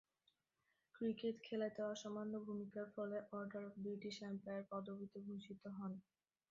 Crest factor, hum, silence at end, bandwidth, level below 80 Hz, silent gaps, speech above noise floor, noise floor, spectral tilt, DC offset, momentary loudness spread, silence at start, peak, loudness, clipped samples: 16 dB; none; 0.5 s; 7.4 kHz; -88 dBFS; none; 39 dB; -87 dBFS; -5.5 dB/octave; under 0.1%; 8 LU; 0.95 s; -32 dBFS; -48 LUFS; under 0.1%